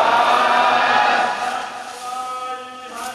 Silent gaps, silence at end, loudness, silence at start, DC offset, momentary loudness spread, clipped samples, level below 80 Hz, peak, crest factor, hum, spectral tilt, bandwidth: none; 0 s; -17 LUFS; 0 s; under 0.1%; 15 LU; under 0.1%; -64 dBFS; -2 dBFS; 16 dB; none; -1.5 dB/octave; 13.5 kHz